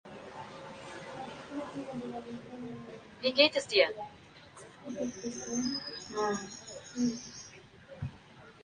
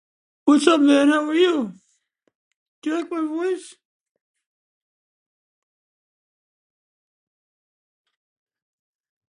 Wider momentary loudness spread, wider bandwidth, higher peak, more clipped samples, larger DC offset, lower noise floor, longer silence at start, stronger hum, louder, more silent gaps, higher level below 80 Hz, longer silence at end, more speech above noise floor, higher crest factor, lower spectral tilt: first, 23 LU vs 13 LU; about the same, 10 kHz vs 11 kHz; second, -10 dBFS vs -2 dBFS; neither; neither; second, -55 dBFS vs -68 dBFS; second, 0.05 s vs 0.45 s; neither; second, -33 LUFS vs -19 LUFS; second, none vs 2.35-2.82 s; first, -66 dBFS vs -76 dBFS; second, 0 s vs 5.6 s; second, 21 dB vs 50 dB; about the same, 26 dB vs 22 dB; about the same, -3 dB/octave vs -3.5 dB/octave